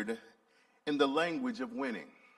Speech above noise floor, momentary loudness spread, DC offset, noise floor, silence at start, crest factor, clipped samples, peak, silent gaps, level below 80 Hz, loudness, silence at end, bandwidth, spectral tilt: 35 dB; 14 LU; under 0.1%; -69 dBFS; 0 s; 20 dB; under 0.1%; -16 dBFS; none; -80 dBFS; -35 LUFS; 0.25 s; 12 kHz; -5 dB/octave